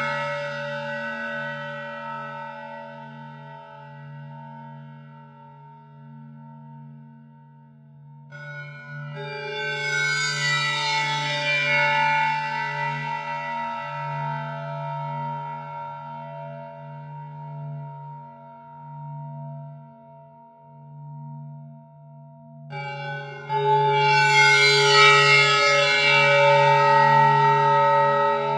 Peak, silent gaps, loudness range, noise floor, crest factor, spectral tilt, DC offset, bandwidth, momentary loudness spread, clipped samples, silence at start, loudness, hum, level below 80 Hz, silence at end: -2 dBFS; none; 26 LU; -49 dBFS; 22 dB; -3.5 dB/octave; under 0.1%; 12 kHz; 25 LU; under 0.1%; 0 s; -20 LUFS; none; -78 dBFS; 0 s